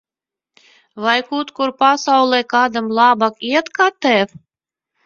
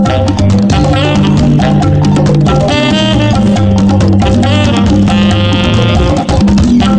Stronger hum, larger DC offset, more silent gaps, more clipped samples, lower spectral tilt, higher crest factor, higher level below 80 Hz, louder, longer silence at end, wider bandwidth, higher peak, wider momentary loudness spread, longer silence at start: neither; neither; neither; neither; second, -3.5 dB/octave vs -6.5 dB/octave; first, 18 dB vs 8 dB; second, -66 dBFS vs -20 dBFS; second, -16 LUFS vs -8 LUFS; first, 0.8 s vs 0 s; second, 7.6 kHz vs 9.4 kHz; about the same, 0 dBFS vs 0 dBFS; first, 8 LU vs 1 LU; first, 0.95 s vs 0 s